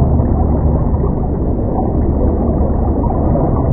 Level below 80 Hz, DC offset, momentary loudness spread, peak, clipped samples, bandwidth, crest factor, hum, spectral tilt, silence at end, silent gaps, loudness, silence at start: -16 dBFS; under 0.1%; 3 LU; 0 dBFS; under 0.1%; 2.2 kHz; 12 dB; none; -16 dB/octave; 0 s; none; -15 LUFS; 0 s